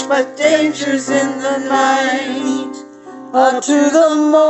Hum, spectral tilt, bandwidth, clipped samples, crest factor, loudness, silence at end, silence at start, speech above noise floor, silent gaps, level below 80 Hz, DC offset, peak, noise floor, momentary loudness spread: none; -3 dB/octave; 8.6 kHz; under 0.1%; 14 dB; -14 LUFS; 0 s; 0 s; 20 dB; none; -66 dBFS; under 0.1%; 0 dBFS; -34 dBFS; 11 LU